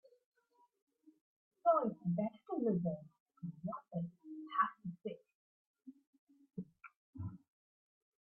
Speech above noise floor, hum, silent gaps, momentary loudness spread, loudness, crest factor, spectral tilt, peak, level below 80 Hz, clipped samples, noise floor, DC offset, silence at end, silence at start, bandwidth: 39 dB; none; 3.20-3.26 s, 5.35-5.74 s, 6.07-6.13 s, 6.19-6.27 s, 6.97-7.13 s; 18 LU; -40 LUFS; 22 dB; -7.5 dB/octave; -20 dBFS; -82 dBFS; under 0.1%; -75 dBFS; under 0.1%; 1 s; 1.65 s; 3.3 kHz